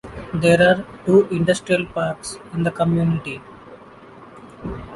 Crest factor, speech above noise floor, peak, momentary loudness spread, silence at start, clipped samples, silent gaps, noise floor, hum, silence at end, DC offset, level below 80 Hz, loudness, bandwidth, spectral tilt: 18 dB; 24 dB; -2 dBFS; 17 LU; 0.05 s; under 0.1%; none; -43 dBFS; none; 0 s; under 0.1%; -46 dBFS; -19 LUFS; 11.5 kHz; -6 dB/octave